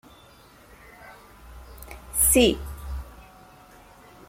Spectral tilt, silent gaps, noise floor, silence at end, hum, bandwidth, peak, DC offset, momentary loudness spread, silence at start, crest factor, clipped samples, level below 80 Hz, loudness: -3 dB/octave; none; -52 dBFS; 1.05 s; none; 16.5 kHz; -6 dBFS; under 0.1%; 29 LU; 1.05 s; 22 dB; under 0.1%; -40 dBFS; -21 LUFS